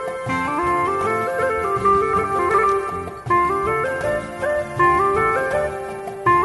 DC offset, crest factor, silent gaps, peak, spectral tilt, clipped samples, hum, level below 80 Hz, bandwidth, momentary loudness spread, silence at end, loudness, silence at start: under 0.1%; 16 dB; none; -4 dBFS; -6 dB/octave; under 0.1%; none; -44 dBFS; 11.5 kHz; 7 LU; 0 s; -20 LUFS; 0 s